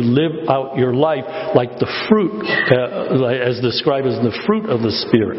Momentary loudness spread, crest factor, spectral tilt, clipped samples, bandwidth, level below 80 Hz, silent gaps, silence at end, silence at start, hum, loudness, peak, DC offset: 3 LU; 16 dB; -9.5 dB/octave; under 0.1%; 6 kHz; -50 dBFS; none; 0 s; 0 s; none; -17 LUFS; 0 dBFS; under 0.1%